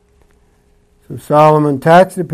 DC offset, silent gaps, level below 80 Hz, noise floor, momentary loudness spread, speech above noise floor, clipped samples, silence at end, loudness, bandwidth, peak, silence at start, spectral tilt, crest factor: under 0.1%; none; -52 dBFS; -52 dBFS; 21 LU; 42 dB; under 0.1%; 0 s; -10 LUFS; 15 kHz; 0 dBFS; 1.1 s; -7 dB/octave; 12 dB